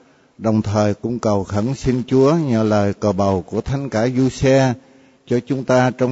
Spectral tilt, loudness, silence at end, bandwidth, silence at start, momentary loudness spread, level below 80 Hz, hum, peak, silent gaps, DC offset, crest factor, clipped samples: -7 dB/octave; -18 LUFS; 0 s; 8 kHz; 0.4 s; 7 LU; -42 dBFS; none; -4 dBFS; none; under 0.1%; 14 dB; under 0.1%